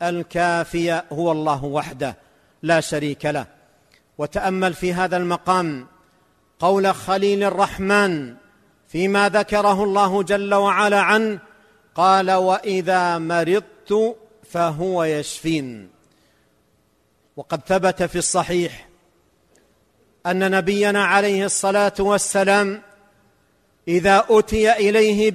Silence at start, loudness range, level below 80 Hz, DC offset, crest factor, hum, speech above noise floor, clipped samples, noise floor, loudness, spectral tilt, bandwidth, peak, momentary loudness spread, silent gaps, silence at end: 0 s; 6 LU; -48 dBFS; under 0.1%; 16 dB; none; 44 dB; under 0.1%; -62 dBFS; -19 LUFS; -4.5 dB/octave; 13.5 kHz; -4 dBFS; 12 LU; none; 0 s